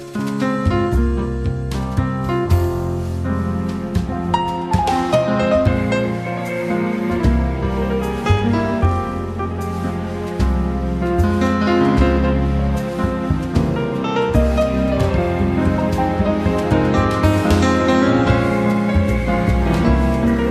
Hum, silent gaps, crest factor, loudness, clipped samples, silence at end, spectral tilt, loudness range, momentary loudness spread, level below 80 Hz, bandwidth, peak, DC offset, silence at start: none; none; 16 dB; -18 LUFS; under 0.1%; 0 s; -7.5 dB/octave; 4 LU; 7 LU; -26 dBFS; 13.5 kHz; -2 dBFS; under 0.1%; 0 s